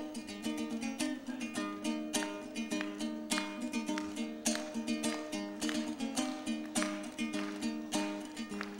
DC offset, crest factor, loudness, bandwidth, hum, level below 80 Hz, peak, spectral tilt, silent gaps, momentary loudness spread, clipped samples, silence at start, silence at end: under 0.1%; 20 dB; -37 LUFS; 16 kHz; none; -70 dBFS; -18 dBFS; -3 dB/octave; none; 5 LU; under 0.1%; 0 s; 0 s